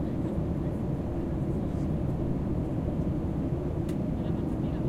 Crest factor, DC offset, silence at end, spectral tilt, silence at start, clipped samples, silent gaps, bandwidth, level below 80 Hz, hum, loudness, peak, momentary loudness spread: 12 dB; under 0.1%; 0 s; -10 dB/octave; 0 s; under 0.1%; none; 13 kHz; -38 dBFS; none; -31 LUFS; -18 dBFS; 1 LU